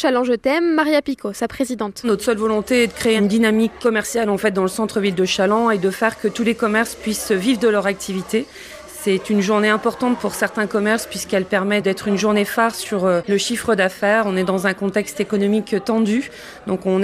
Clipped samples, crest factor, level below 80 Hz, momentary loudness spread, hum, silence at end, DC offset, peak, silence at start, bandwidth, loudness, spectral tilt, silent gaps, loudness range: under 0.1%; 16 dB; -52 dBFS; 7 LU; none; 0 s; under 0.1%; -4 dBFS; 0 s; 15.5 kHz; -19 LUFS; -4.5 dB/octave; none; 2 LU